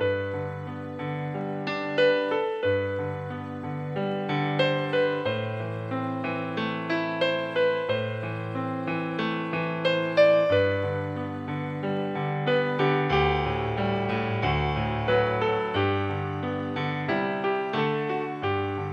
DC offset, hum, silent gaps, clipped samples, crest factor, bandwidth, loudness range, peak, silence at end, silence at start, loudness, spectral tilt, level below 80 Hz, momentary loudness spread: under 0.1%; none; none; under 0.1%; 18 dB; 8.2 kHz; 3 LU; -8 dBFS; 0 s; 0 s; -27 LUFS; -7.5 dB/octave; -48 dBFS; 9 LU